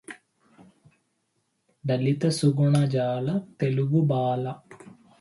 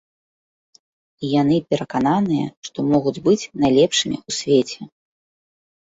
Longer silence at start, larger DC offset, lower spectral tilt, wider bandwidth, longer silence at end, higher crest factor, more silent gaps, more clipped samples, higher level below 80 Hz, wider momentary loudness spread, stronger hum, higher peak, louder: second, 0.1 s vs 1.2 s; neither; first, -7.5 dB/octave vs -5 dB/octave; first, 11.5 kHz vs 8 kHz; second, 0.3 s vs 1.1 s; about the same, 16 dB vs 16 dB; second, none vs 2.57-2.63 s; neither; second, -66 dBFS vs -56 dBFS; first, 14 LU vs 10 LU; neither; second, -10 dBFS vs -4 dBFS; second, -25 LUFS vs -19 LUFS